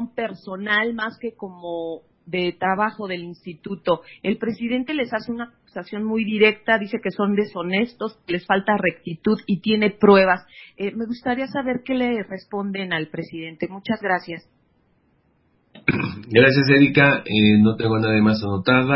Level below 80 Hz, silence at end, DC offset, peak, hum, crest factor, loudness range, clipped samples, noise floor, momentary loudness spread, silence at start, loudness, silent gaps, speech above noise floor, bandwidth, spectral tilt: -52 dBFS; 0 s; under 0.1%; 0 dBFS; none; 20 dB; 9 LU; under 0.1%; -63 dBFS; 16 LU; 0 s; -21 LUFS; none; 42 dB; 5.8 kHz; -10.5 dB/octave